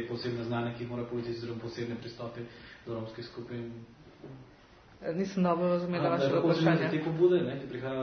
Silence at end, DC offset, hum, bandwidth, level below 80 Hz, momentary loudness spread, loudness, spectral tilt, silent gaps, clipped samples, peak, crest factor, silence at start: 0 s; under 0.1%; none; 6.6 kHz; -64 dBFS; 19 LU; -31 LUFS; -7.5 dB/octave; none; under 0.1%; -12 dBFS; 20 dB; 0 s